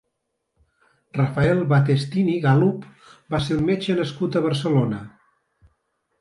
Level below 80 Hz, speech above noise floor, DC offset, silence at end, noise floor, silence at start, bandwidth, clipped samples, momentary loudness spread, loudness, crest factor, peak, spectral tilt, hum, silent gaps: -50 dBFS; 56 dB; under 0.1%; 1.1 s; -77 dBFS; 1.15 s; 11 kHz; under 0.1%; 9 LU; -21 LUFS; 18 dB; -6 dBFS; -7.5 dB/octave; none; none